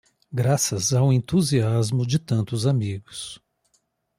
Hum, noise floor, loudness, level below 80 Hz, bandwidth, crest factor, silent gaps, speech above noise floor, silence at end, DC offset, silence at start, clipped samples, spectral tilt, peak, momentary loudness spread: none; -69 dBFS; -22 LUFS; -56 dBFS; 15 kHz; 14 dB; none; 47 dB; 0.85 s; under 0.1%; 0.3 s; under 0.1%; -5.5 dB/octave; -8 dBFS; 13 LU